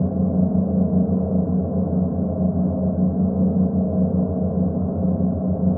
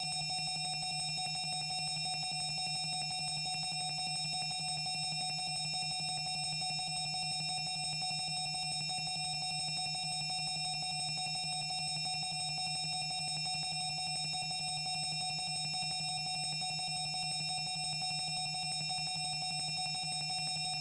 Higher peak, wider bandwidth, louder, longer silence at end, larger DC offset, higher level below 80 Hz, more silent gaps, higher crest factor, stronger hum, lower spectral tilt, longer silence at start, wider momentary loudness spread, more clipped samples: first, -8 dBFS vs -28 dBFS; second, 1.6 kHz vs 11 kHz; first, -21 LUFS vs -35 LUFS; about the same, 0 s vs 0 s; neither; first, -38 dBFS vs -70 dBFS; neither; about the same, 12 dB vs 8 dB; first, 60 Hz at -35 dBFS vs none; first, -17.5 dB/octave vs -1 dB/octave; about the same, 0 s vs 0 s; about the same, 3 LU vs 1 LU; neither